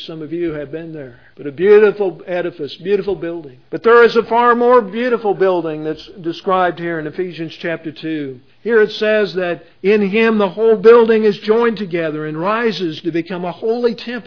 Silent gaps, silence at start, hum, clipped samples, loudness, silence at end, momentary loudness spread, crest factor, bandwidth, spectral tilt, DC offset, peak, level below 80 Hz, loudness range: none; 0 s; none; under 0.1%; -15 LUFS; 0.05 s; 16 LU; 16 dB; 5.4 kHz; -7 dB/octave; 0.3%; 0 dBFS; -56 dBFS; 6 LU